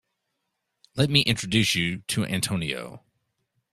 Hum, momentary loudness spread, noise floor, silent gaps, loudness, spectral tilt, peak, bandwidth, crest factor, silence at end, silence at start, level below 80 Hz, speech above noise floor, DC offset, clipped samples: none; 13 LU; -79 dBFS; none; -24 LUFS; -4 dB/octave; -4 dBFS; 15 kHz; 24 dB; 0.75 s; 0.95 s; -56 dBFS; 54 dB; under 0.1%; under 0.1%